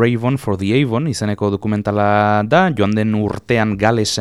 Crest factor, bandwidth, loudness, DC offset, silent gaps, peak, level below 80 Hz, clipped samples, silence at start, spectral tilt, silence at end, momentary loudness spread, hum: 16 dB; 13.5 kHz; -16 LUFS; under 0.1%; none; 0 dBFS; -46 dBFS; under 0.1%; 0 s; -6 dB/octave; 0 s; 6 LU; none